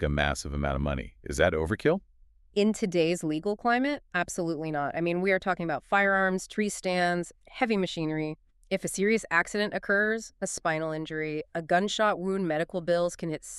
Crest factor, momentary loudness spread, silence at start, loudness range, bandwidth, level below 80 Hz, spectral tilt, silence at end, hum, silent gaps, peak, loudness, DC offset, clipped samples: 20 dB; 7 LU; 0 s; 1 LU; 13.5 kHz; -46 dBFS; -5 dB/octave; 0 s; none; none; -10 dBFS; -28 LUFS; under 0.1%; under 0.1%